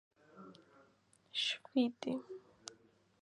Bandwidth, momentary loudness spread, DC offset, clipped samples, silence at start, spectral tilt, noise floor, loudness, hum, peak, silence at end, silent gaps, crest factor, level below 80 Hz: 11 kHz; 22 LU; under 0.1%; under 0.1%; 0.35 s; -3 dB/octave; -71 dBFS; -38 LUFS; none; -22 dBFS; 0.5 s; none; 20 dB; -88 dBFS